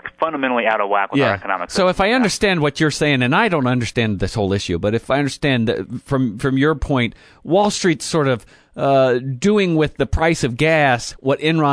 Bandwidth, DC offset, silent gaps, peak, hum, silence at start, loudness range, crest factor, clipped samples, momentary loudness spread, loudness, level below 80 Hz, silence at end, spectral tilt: 11 kHz; under 0.1%; none; -2 dBFS; none; 0.05 s; 2 LU; 14 dB; under 0.1%; 6 LU; -18 LUFS; -38 dBFS; 0 s; -5.5 dB/octave